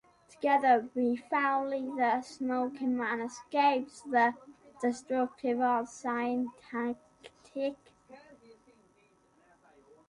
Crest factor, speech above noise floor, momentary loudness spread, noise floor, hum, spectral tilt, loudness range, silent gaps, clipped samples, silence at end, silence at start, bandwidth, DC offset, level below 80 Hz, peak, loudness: 20 dB; 36 dB; 9 LU; -67 dBFS; none; -4 dB/octave; 10 LU; none; under 0.1%; 1.9 s; 0.4 s; 11 kHz; under 0.1%; -76 dBFS; -14 dBFS; -31 LUFS